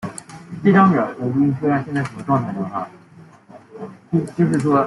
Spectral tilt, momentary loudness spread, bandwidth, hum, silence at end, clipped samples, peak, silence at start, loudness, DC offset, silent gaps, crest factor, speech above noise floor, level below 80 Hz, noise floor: -8 dB/octave; 22 LU; 11.5 kHz; none; 0 s; under 0.1%; -2 dBFS; 0 s; -19 LUFS; under 0.1%; none; 18 dB; 28 dB; -56 dBFS; -46 dBFS